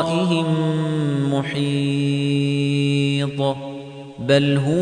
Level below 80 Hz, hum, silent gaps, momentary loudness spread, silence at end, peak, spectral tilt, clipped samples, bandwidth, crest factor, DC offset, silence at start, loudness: -58 dBFS; none; none; 9 LU; 0 s; -4 dBFS; -6.5 dB/octave; under 0.1%; 10 kHz; 14 dB; under 0.1%; 0 s; -20 LUFS